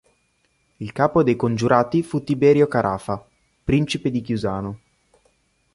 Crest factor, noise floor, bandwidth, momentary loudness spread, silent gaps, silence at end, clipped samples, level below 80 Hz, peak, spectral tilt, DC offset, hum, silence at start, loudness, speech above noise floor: 20 dB; -66 dBFS; 11.5 kHz; 16 LU; none; 1 s; under 0.1%; -48 dBFS; -2 dBFS; -7 dB/octave; under 0.1%; none; 0.8 s; -20 LUFS; 46 dB